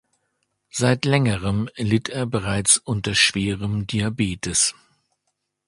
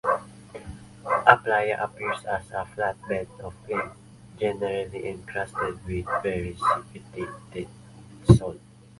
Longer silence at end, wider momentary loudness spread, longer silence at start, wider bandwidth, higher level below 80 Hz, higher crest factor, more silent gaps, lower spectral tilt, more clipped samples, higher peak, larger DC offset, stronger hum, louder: first, 0.95 s vs 0.4 s; second, 8 LU vs 21 LU; first, 0.75 s vs 0.05 s; about the same, 11.5 kHz vs 11.5 kHz; about the same, -46 dBFS vs -44 dBFS; second, 20 dB vs 26 dB; neither; second, -3.5 dB/octave vs -7 dB/octave; neither; about the same, -2 dBFS vs 0 dBFS; neither; neither; first, -21 LUFS vs -26 LUFS